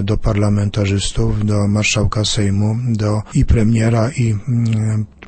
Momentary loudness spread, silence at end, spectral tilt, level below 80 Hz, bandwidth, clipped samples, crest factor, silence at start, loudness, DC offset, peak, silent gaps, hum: 4 LU; 0.2 s; -6 dB/octave; -26 dBFS; 8.8 kHz; under 0.1%; 14 dB; 0 s; -16 LUFS; under 0.1%; 0 dBFS; none; none